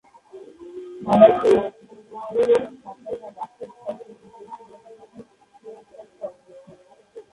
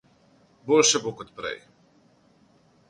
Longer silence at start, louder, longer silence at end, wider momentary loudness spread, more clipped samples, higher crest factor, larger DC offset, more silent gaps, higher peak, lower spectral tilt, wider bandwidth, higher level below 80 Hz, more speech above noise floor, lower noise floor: second, 0.35 s vs 0.65 s; first, -18 LUFS vs -23 LUFS; second, 0.1 s vs 1.35 s; first, 28 LU vs 21 LU; neither; about the same, 24 dB vs 22 dB; neither; neither; first, 0 dBFS vs -6 dBFS; first, -7 dB/octave vs -2 dB/octave; about the same, 11.5 kHz vs 11 kHz; first, -60 dBFS vs -68 dBFS; about the same, 35 dB vs 37 dB; second, -51 dBFS vs -60 dBFS